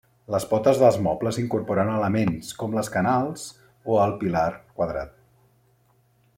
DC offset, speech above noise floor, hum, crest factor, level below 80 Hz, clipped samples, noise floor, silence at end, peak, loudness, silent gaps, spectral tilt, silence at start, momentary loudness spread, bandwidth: under 0.1%; 40 dB; none; 20 dB; -54 dBFS; under 0.1%; -63 dBFS; 1.3 s; -6 dBFS; -24 LUFS; none; -6.5 dB/octave; 0.3 s; 12 LU; 16.5 kHz